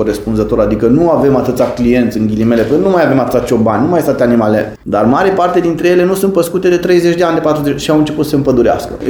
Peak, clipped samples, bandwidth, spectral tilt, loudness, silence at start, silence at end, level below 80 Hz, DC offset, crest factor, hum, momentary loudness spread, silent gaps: 0 dBFS; under 0.1%; 19.5 kHz; -6.5 dB/octave; -11 LUFS; 0 s; 0 s; -34 dBFS; under 0.1%; 10 dB; none; 3 LU; none